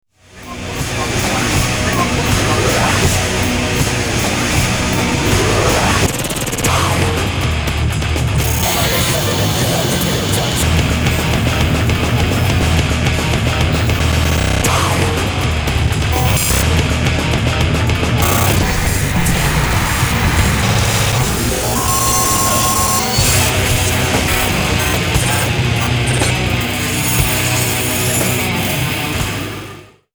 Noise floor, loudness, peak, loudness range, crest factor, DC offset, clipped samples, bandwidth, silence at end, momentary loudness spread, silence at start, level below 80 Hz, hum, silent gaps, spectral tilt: -35 dBFS; -14 LUFS; 0 dBFS; 2 LU; 14 dB; under 0.1%; under 0.1%; over 20 kHz; 0.3 s; 4 LU; 0.35 s; -24 dBFS; none; none; -4 dB/octave